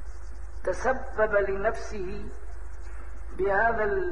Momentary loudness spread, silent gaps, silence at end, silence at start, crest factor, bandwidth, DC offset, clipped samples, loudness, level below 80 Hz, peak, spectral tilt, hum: 19 LU; none; 0 s; 0 s; 18 dB; 10 kHz; 3%; under 0.1%; -28 LUFS; -40 dBFS; -12 dBFS; -6 dB/octave; none